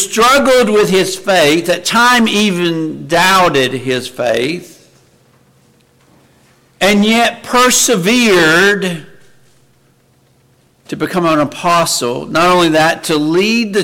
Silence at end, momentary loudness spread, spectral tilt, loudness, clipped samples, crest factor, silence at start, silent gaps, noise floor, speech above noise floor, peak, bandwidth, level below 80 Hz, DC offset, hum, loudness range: 0 s; 8 LU; -3.5 dB/octave; -11 LUFS; under 0.1%; 12 dB; 0 s; none; -52 dBFS; 41 dB; 0 dBFS; 17 kHz; -46 dBFS; under 0.1%; none; 7 LU